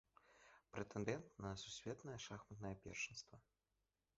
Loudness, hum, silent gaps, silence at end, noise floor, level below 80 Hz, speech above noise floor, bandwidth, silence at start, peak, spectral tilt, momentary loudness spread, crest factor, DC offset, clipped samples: -51 LUFS; none; none; 0.75 s; under -90 dBFS; -72 dBFS; over 39 dB; 7.6 kHz; 0.25 s; -28 dBFS; -4.5 dB/octave; 16 LU; 24 dB; under 0.1%; under 0.1%